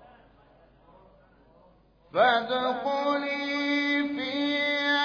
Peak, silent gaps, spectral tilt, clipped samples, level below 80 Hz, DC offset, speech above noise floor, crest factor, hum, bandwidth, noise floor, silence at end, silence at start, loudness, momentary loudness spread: -10 dBFS; none; -4 dB/octave; under 0.1%; -66 dBFS; under 0.1%; 34 dB; 18 dB; none; 5.4 kHz; -59 dBFS; 0 s; 2.15 s; -26 LUFS; 6 LU